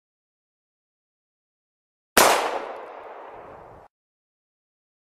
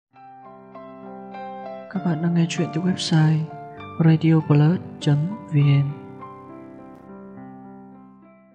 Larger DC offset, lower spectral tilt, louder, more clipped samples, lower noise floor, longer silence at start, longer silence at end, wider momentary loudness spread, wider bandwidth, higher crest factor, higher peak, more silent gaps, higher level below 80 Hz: neither; second, -1 dB/octave vs -7 dB/octave; about the same, -20 LUFS vs -21 LUFS; neither; second, -45 dBFS vs -49 dBFS; first, 2.15 s vs 0.25 s; first, 1.55 s vs 0.6 s; about the same, 24 LU vs 24 LU; first, 14.5 kHz vs 9.4 kHz; first, 28 dB vs 18 dB; first, 0 dBFS vs -6 dBFS; neither; first, -58 dBFS vs -70 dBFS